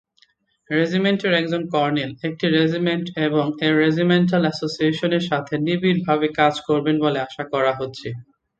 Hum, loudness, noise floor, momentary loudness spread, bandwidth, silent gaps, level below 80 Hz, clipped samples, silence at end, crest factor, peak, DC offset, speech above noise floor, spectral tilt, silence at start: none; -20 LUFS; -61 dBFS; 7 LU; 8 kHz; none; -62 dBFS; under 0.1%; 0.35 s; 18 dB; -4 dBFS; under 0.1%; 41 dB; -6.5 dB/octave; 0.7 s